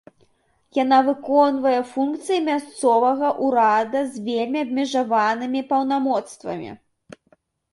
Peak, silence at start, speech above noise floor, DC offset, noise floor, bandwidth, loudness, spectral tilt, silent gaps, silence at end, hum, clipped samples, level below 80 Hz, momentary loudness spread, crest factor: -4 dBFS; 0.75 s; 42 dB; under 0.1%; -62 dBFS; 11.5 kHz; -21 LUFS; -4.5 dB/octave; none; 0.95 s; none; under 0.1%; -68 dBFS; 8 LU; 18 dB